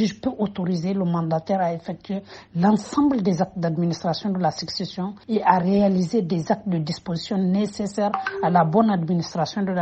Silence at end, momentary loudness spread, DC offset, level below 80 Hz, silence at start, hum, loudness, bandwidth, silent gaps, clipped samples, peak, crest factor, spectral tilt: 0 s; 9 LU; under 0.1%; -58 dBFS; 0 s; none; -23 LUFS; 8.6 kHz; none; under 0.1%; -2 dBFS; 20 dB; -7 dB/octave